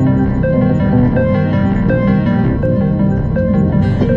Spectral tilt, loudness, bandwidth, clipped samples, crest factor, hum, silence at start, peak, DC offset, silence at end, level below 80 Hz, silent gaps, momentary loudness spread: -10.5 dB/octave; -13 LUFS; 5.6 kHz; under 0.1%; 12 dB; none; 0 s; 0 dBFS; under 0.1%; 0 s; -26 dBFS; none; 2 LU